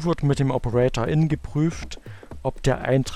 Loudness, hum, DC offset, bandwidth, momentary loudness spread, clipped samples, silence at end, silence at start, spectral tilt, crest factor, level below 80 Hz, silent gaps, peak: -23 LUFS; none; under 0.1%; 12.5 kHz; 15 LU; under 0.1%; 0 s; 0 s; -7 dB/octave; 14 dB; -38 dBFS; none; -8 dBFS